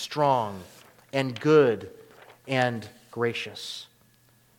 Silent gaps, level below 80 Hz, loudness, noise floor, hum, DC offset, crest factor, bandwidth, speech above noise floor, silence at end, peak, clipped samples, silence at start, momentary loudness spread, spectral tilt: none; -72 dBFS; -26 LUFS; -61 dBFS; none; under 0.1%; 20 dB; 17 kHz; 36 dB; 0.75 s; -8 dBFS; under 0.1%; 0 s; 20 LU; -5.5 dB/octave